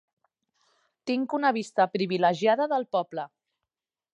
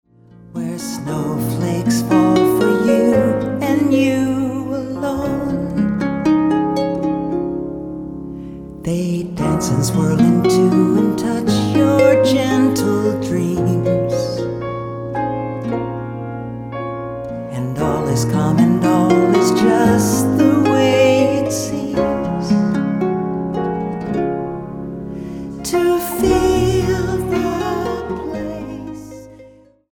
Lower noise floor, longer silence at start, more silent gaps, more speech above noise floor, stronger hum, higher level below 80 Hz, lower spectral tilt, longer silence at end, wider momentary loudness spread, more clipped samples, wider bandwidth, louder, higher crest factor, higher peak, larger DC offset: first, -88 dBFS vs -45 dBFS; first, 1.05 s vs 0.4 s; neither; first, 63 dB vs 29 dB; neither; second, -82 dBFS vs -40 dBFS; about the same, -5.5 dB/octave vs -6.5 dB/octave; first, 0.9 s vs 0.45 s; about the same, 13 LU vs 14 LU; neither; second, 10.5 kHz vs 17.5 kHz; second, -26 LUFS vs -17 LUFS; about the same, 18 dB vs 16 dB; second, -10 dBFS vs -2 dBFS; neither